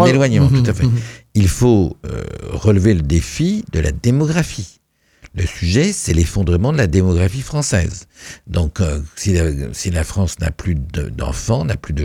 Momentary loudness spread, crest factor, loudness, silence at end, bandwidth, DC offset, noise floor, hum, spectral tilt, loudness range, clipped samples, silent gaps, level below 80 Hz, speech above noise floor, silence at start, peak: 11 LU; 16 dB; -17 LUFS; 0 s; 15.5 kHz; under 0.1%; -47 dBFS; none; -6 dB/octave; 4 LU; under 0.1%; none; -28 dBFS; 31 dB; 0 s; 0 dBFS